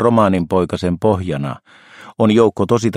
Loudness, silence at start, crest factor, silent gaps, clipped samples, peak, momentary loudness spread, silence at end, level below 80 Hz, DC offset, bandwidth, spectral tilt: -16 LUFS; 0 s; 16 dB; none; under 0.1%; 0 dBFS; 13 LU; 0 s; -46 dBFS; under 0.1%; 11.5 kHz; -7 dB/octave